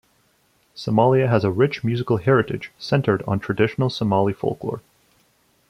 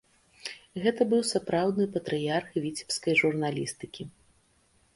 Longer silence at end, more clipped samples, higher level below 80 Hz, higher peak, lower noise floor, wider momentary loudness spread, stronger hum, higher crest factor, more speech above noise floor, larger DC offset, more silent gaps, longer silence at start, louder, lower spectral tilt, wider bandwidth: about the same, 0.9 s vs 0.85 s; neither; first, -54 dBFS vs -66 dBFS; first, -4 dBFS vs -10 dBFS; second, -62 dBFS vs -66 dBFS; second, 12 LU vs 17 LU; neither; about the same, 18 dB vs 20 dB; first, 42 dB vs 38 dB; neither; neither; first, 0.75 s vs 0.45 s; first, -21 LUFS vs -28 LUFS; first, -8 dB/octave vs -4.5 dB/octave; about the same, 11.5 kHz vs 11.5 kHz